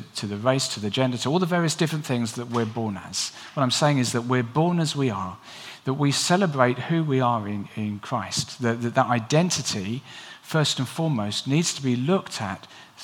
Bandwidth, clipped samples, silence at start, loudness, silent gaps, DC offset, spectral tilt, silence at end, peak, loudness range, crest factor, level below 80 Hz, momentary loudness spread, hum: 17 kHz; under 0.1%; 0 s; -24 LUFS; none; under 0.1%; -4.5 dB/octave; 0 s; -2 dBFS; 2 LU; 22 dB; -68 dBFS; 10 LU; none